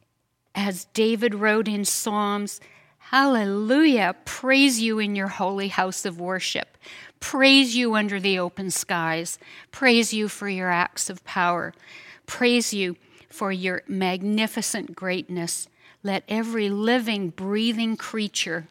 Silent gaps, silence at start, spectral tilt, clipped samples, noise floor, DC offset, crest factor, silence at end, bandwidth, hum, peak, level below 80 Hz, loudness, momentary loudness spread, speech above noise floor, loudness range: none; 0.55 s; -3.5 dB/octave; under 0.1%; -72 dBFS; under 0.1%; 20 dB; 0.05 s; 17 kHz; none; -4 dBFS; -68 dBFS; -23 LUFS; 12 LU; 49 dB; 5 LU